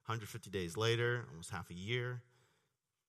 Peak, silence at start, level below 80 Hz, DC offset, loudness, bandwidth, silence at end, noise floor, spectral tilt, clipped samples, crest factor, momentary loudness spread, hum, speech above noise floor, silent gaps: -20 dBFS; 0.05 s; -70 dBFS; under 0.1%; -39 LUFS; 13 kHz; 0.85 s; -85 dBFS; -5 dB/octave; under 0.1%; 22 dB; 12 LU; none; 45 dB; none